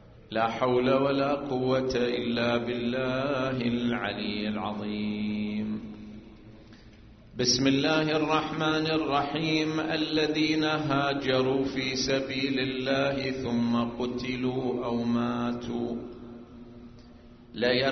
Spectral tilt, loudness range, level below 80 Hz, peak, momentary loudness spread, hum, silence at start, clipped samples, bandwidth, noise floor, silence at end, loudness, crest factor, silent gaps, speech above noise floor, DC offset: -4 dB/octave; 6 LU; -54 dBFS; -10 dBFS; 10 LU; none; 0.05 s; under 0.1%; 6.4 kHz; -51 dBFS; 0 s; -28 LUFS; 18 dB; none; 24 dB; under 0.1%